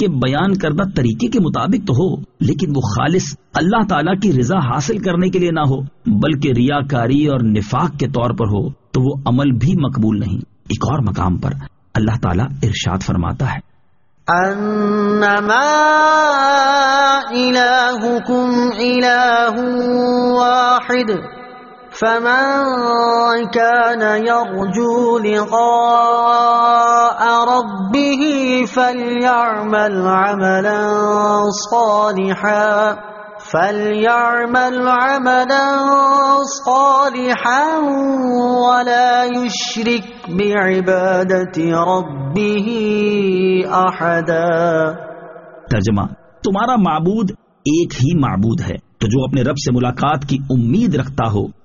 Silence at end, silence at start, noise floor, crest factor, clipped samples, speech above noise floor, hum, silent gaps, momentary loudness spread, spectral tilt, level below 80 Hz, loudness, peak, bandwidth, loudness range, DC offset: 0.15 s; 0 s; -60 dBFS; 14 dB; under 0.1%; 45 dB; none; none; 7 LU; -4.5 dB/octave; -42 dBFS; -15 LUFS; 0 dBFS; 7.4 kHz; 5 LU; under 0.1%